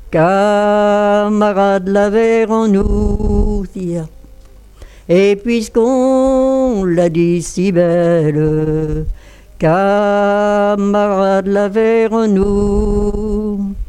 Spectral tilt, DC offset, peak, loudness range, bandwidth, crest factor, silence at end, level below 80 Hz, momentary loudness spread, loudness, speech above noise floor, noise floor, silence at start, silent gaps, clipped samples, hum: -7 dB/octave; under 0.1%; 0 dBFS; 3 LU; 12 kHz; 12 dB; 0.05 s; -26 dBFS; 7 LU; -13 LUFS; 26 dB; -38 dBFS; 0 s; none; under 0.1%; none